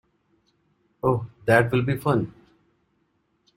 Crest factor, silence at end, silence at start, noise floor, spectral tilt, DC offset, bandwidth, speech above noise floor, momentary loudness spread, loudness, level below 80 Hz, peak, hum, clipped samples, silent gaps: 22 dB; 1.25 s; 1.05 s; -70 dBFS; -7.5 dB/octave; under 0.1%; 15.5 kHz; 48 dB; 8 LU; -23 LUFS; -56 dBFS; -4 dBFS; none; under 0.1%; none